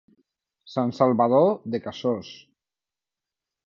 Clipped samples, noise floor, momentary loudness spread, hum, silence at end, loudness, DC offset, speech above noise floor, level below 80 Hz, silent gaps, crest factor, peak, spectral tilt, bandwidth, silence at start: under 0.1%; under -90 dBFS; 13 LU; none; 1.3 s; -23 LUFS; under 0.1%; over 67 dB; -68 dBFS; none; 20 dB; -6 dBFS; -8 dB/octave; 7.2 kHz; 0.7 s